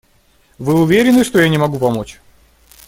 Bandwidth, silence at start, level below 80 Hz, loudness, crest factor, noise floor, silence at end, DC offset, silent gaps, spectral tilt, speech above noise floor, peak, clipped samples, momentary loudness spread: 17 kHz; 0.6 s; -46 dBFS; -14 LUFS; 14 dB; -53 dBFS; 0.75 s; under 0.1%; none; -6 dB/octave; 41 dB; 0 dBFS; under 0.1%; 13 LU